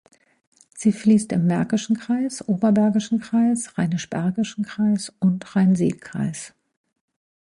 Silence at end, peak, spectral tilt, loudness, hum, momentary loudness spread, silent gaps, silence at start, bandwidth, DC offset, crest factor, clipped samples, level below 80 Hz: 0.95 s; -6 dBFS; -6.5 dB/octave; -22 LUFS; none; 8 LU; none; 0.75 s; 11 kHz; under 0.1%; 16 dB; under 0.1%; -60 dBFS